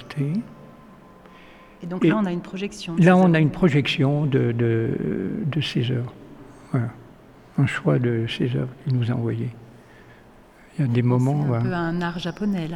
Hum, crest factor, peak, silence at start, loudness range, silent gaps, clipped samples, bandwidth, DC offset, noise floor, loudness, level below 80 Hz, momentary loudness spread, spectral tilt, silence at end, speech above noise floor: none; 20 dB; -4 dBFS; 0 s; 6 LU; none; under 0.1%; 11 kHz; under 0.1%; -49 dBFS; -22 LUFS; -52 dBFS; 11 LU; -7.5 dB/octave; 0 s; 28 dB